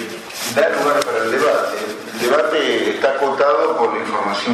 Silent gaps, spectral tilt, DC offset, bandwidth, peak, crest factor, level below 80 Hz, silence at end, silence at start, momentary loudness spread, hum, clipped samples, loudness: none; -3 dB/octave; under 0.1%; 13.5 kHz; -2 dBFS; 16 dB; -64 dBFS; 0 s; 0 s; 7 LU; none; under 0.1%; -17 LUFS